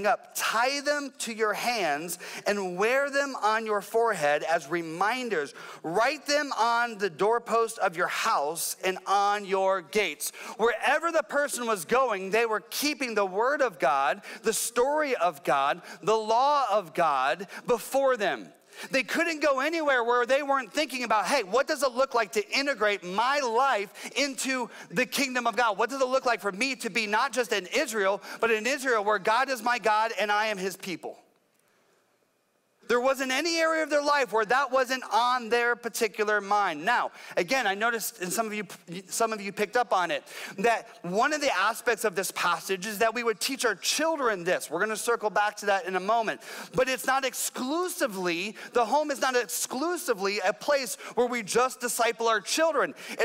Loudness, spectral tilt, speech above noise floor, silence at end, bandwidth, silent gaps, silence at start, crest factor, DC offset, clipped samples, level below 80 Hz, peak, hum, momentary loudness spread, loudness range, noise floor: -27 LUFS; -2.5 dB/octave; 44 dB; 0 s; 16 kHz; none; 0 s; 14 dB; under 0.1%; under 0.1%; -70 dBFS; -14 dBFS; none; 5 LU; 2 LU; -71 dBFS